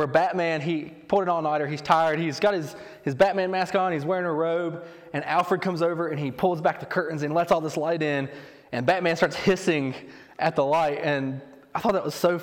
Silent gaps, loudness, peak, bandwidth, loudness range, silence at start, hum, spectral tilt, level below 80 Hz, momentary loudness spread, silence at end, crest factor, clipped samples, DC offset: none; -25 LUFS; -6 dBFS; 17.5 kHz; 2 LU; 0 s; none; -6 dB/octave; -62 dBFS; 10 LU; 0 s; 20 dB; under 0.1%; under 0.1%